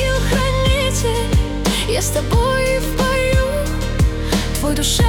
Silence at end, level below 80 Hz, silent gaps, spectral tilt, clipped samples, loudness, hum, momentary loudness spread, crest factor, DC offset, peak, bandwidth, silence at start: 0 s; -22 dBFS; none; -4.5 dB/octave; under 0.1%; -18 LUFS; none; 3 LU; 12 dB; under 0.1%; -4 dBFS; 19 kHz; 0 s